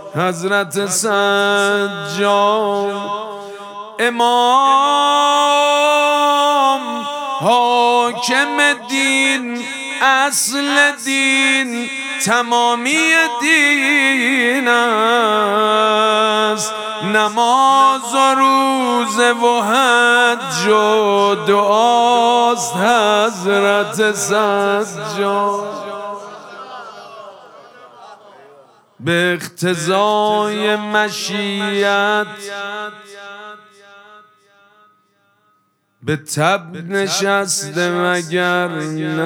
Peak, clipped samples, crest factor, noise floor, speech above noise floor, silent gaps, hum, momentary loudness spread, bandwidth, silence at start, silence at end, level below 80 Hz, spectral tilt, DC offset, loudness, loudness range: 0 dBFS; under 0.1%; 16 dB; -62 dBFS; 47 dB; none; none; 12 LU; 18 kHz; 0 s; 0 s; -74 dBFS; -3 dB/octave; under 0.1%; -14 LUFS; 10 LU